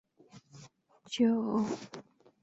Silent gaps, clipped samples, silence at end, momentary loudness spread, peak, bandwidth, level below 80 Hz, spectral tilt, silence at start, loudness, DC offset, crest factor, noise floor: none; under 0.1%; 0.4 s; 22 LU; -16 dBFS; 8 kHz; -76 dBFS; -5.5 dB/octave; 0.35 s; -32 LUFS; under 0.1%; 18 dB; -59 dBFS